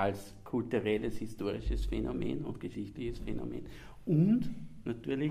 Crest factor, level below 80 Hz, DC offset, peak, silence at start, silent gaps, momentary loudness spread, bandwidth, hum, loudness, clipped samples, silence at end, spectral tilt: 18 dB; -44 dBFS; under 0.1%; -16 dBFS; 0 s; none; 13 LU; 15 kHz; none; -35 LUFS; under 0.1%; 0 s; -8 dB/octave